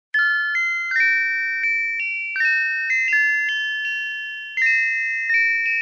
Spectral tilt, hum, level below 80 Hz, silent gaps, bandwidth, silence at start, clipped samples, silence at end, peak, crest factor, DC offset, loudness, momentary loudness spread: 3 dB/octave; none; under -90 dBFS; none; 7.4 kHz; 0.15 s; under 0.1%; 0 s; -8 dBFS; 12 dB; under 0.1%; -19 LUFS; 6 LU